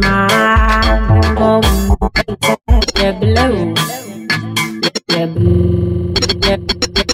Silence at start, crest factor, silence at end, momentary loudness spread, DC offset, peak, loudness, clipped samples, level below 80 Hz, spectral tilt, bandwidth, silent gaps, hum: 0 s; 12 dB; 0 s; 6 LU; under 0.1%; 0 dBFS; -13 LUFS; under 0.1%; -20 dBFS; -5 dB/octave; 16.5 kHz; none; none